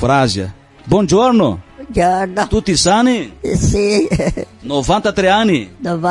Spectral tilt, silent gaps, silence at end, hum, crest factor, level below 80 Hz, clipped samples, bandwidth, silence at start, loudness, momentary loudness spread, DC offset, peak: -5 dB/octave; none; 0 s; none; 14 dB; -32 dBFS; under 0.1%; 11.5 kHz; 0 s; -14 LUFS; 10 LU; under 0.1%; -2 dBFS